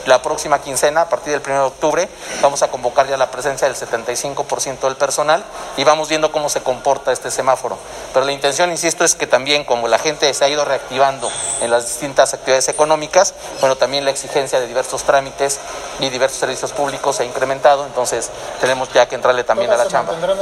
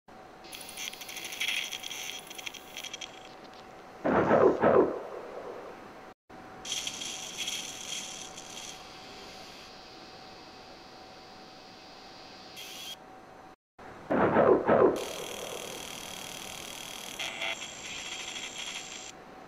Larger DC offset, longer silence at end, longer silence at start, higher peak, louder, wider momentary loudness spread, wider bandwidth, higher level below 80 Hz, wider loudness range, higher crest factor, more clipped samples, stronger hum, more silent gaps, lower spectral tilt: neither; about the same, 0 s vs 0 s; about the same, 0 s vs 0.1 s; first, 0 dBFS vs -10 dBFS; first, -17 LUFS vs -31 LUFS; second, 6 LU vs 24 LU; about the same, 16 kHz vs 16 kHz; first, -50 dBFS vs -62 dBFS; second, 2 LU vs 17 LU; second, 16 dB vs 24 dB; neither; neither; second, none vs 6.14-6.28 s, 13.55-13.78 s; second, -2 dB/octave vs -3.5 dB/octave